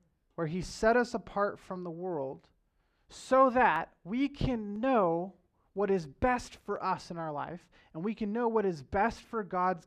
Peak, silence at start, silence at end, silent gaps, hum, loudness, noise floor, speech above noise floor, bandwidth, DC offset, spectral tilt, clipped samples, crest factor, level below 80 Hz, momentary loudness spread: -12 dBFS; 0.4 s; 0.05 s; none; none; -32 LUFS; -73 dBFS; 42 dB; 11.5 kHz; under 0.1%; -6 dB/octave; under 0.1%; 20 dB; -54 dBFS; 14 LU